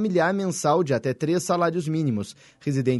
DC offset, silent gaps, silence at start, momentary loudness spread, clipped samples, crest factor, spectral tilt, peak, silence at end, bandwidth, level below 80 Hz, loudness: under 0.1%; none; 0 s; 7 LU; under 0.1%; 16 dB; -6 dB/octave; -8 dBFS; 0 s; 11.5 kHz; -64 dBFS; -24 LUFS